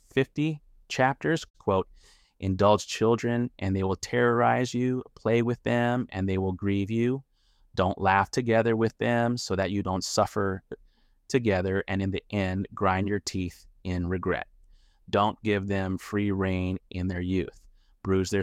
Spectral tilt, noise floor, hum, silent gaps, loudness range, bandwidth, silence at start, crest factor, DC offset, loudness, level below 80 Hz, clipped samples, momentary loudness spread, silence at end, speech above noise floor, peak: -6 dB/octave; -58 dBFS; none; 1.50-1.54 s; 4 LU; 14.5 kHz; 0.15 s; 20 dB; under 0.1%; -27 LUFS; -54 dBFS; under 0.1%; 9 LU; 0 s; 32 dB; -8 dBFS